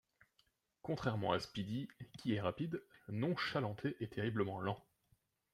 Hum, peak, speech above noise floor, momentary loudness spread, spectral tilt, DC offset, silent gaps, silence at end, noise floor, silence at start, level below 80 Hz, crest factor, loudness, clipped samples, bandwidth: none; -20 dBFS; 39 dB; 9 LU; -7 dB/octave; under 0.1%; none; 0.75 s; -79 dBFS; 0.85 s; -72 dBFS; 22 dB; -41 LUFS; under 0.1%; 14 kHz